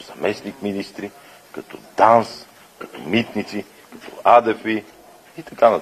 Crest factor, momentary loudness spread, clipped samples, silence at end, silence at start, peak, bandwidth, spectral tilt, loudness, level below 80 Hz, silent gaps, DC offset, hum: 20 dB; 24 LU; under 0.1%; 0 s; 0 s; 0 dBFS; 15 kHz; -5.5 dB/octave; -19 LUFS; -62 dBFS; none; under 0.1%; none